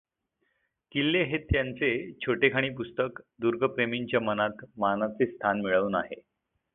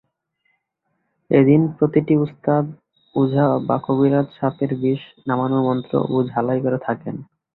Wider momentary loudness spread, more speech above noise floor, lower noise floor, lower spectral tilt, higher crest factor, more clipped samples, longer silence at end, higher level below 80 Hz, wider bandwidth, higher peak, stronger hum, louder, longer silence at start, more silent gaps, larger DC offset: second, 7 LU vs 10 LU; second, 49 dB vs 54 dB; first, -77 dBFS vs -73 dBFS; second, -10 dB/octave vs -12.5 dB/octave; about the same, 22 dB vs 18 dB; neither; first, 0.55 s vs 0.3 s; first, -50 dBFS vs -58 dBFS; about the same, 4.1 kHz vs 4.2 kHz; second, -8 dBFS vs -2 dBFS; neither; second, -28 LUFS vs -19 LUFS; second, 0.95 s vs 1.3 s; neither; neither